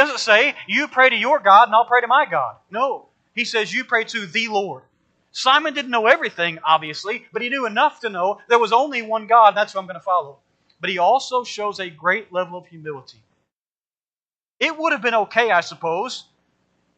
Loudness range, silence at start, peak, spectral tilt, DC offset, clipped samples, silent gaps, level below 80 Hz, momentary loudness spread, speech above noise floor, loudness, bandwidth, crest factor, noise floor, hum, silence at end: 7 LU; 0 s; 0 dBFS; -2.5 dB/octave; under 0.1%; under 0.1%; 13.53-13.70 s, 13.87-13.91 s, 14.48-14.52 s; -78 dBFS; 14 LU; over 71 dB; -18 LUFS; 9 kHz; 20 dB; under -90 dBFS; none; 0.75 s